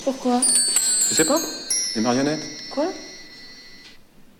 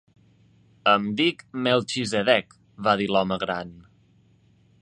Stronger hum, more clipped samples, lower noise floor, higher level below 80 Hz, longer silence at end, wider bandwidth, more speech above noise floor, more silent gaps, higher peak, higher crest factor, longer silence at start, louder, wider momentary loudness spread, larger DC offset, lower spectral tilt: neither; neither; second, -47 dBFS vs -59 dBFS; first, -56 dBFS vs -62 dBFS; second, 0.15 s vs 1 s; first, 17 kHz vs 10.5 kHz; second, 26 dB vs 36 dB; neither; about the same, -4 dBFS vs -4 dBFS; about the same, 18 dB vs 22 dB; second, 0 s vs 0.85 s; first, -19 LUFS vs -23 LUFS; first, 21 LU vs 7 LU; neither; second, -1.5 dB/octave vs -4.5 dB/octave